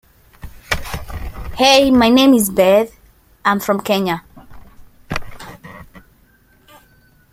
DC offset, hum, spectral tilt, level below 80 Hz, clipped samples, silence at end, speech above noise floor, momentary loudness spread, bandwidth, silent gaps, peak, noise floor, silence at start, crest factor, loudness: under 0.1%; none; -4 dB/octave; -38 dBFS; under 0.1%; 1.35 s; 40 dB; 20 LU; 16 kHz; none; 0 dBFS; -53 dBFS; 0.45 s; 18 dB; -15 LUFS